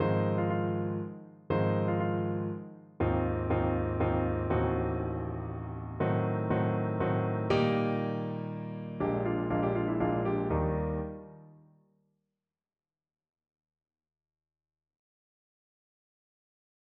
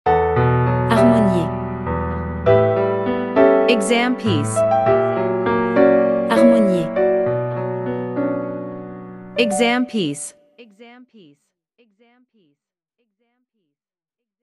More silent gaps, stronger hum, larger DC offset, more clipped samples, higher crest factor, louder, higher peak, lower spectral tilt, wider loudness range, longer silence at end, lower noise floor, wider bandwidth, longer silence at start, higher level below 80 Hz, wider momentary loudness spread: neither; neither; neither; neither; about the same, 18 dB vs 18 dB; second, -31 LUFS vs -17 LUFS; second, -14 dBFS vs -2 dBFS; first, -7.5 dB/octave vs -6 dB/octave; second, 4 LU vs 7 LU; first, 5.45 s vs 3.55 s; about the same, under -90 dBFS vs -87 dBFS; second, 5.8 kHz vs 12 kHz; about the same, 0 s vs 0.05 s; second, -48 dBFS vs -42 dBFS; about the same, 10 LU vs 11 LU